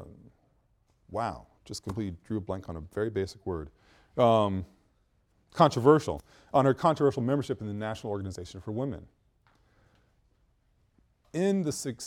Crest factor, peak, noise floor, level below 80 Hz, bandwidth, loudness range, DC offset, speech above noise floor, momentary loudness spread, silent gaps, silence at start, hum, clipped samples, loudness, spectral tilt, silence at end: 24 dB; -6 dBFS; -69 dBFS; -56 dBFS; 15.5 kHz; 12 LU; under 0.1%; 41 dB; 17 LU; none; 0 s; none; under 0.1%; -29 LUFS; -6.5 dB/octave; 0 s